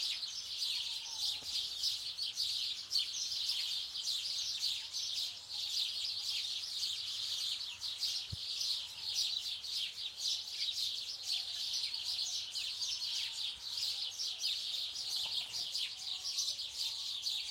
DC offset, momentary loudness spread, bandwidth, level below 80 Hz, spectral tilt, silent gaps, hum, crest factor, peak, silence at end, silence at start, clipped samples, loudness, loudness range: under 0.1%; 3 LU; 16.5 kHz; -74 dBFS; 2 dB/octave; none; none; 18 dB; -22 dBFS; 0 s; 0 s; under 0.1%; -36 LUFS; 1 LU